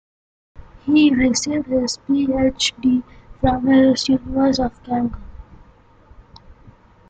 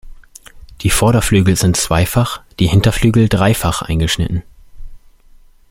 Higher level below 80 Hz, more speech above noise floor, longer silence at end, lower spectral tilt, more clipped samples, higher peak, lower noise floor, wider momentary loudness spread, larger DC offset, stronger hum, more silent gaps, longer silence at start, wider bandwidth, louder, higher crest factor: second, -40 dBFS vs -28 dBFS; about the same, 32 dB vs 31 dB; second, 0.4 s vs 0.75 s; about the same, -4.5 dB/octave vs -5 dB/octave; neither; second, -4 dBFS vs 0 dBFS; first, -49 dBFS vs -44 dBFS; first, 9 LU vs 6 LU; neither; neither; neither; first, 0.55 s vs 0.05 s; second, 9.2 kHz vs 16.5 kHz; second, -18 LUFS vs -14 LUFS; about the same, 16 dB vs 14 dB